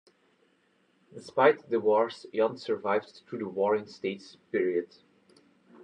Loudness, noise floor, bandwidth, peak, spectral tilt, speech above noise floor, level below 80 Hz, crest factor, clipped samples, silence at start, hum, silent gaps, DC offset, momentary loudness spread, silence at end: -29 LUFS; -69 dBFS; 9.6 kHz; -10 dBFS; -6 dB/octave; 40 dB; -84 dBFS; 20 dB; under 0.1%; 1.15 s; none; none; under 0.1%; 14 LU; 1 s